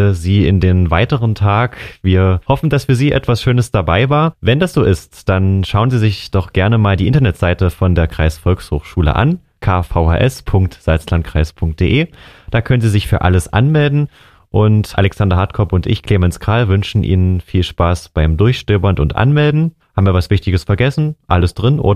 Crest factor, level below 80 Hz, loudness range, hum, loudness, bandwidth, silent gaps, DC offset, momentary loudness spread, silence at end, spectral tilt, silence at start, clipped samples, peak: 12 dB; -26 dBFS; 2 LU; none; -14 LUFS; 13.5 kHz; none; 0.4%; 5 LU; 0 s; -7.5 dB/octave; 0 s; under 0.1%; 0 dBFS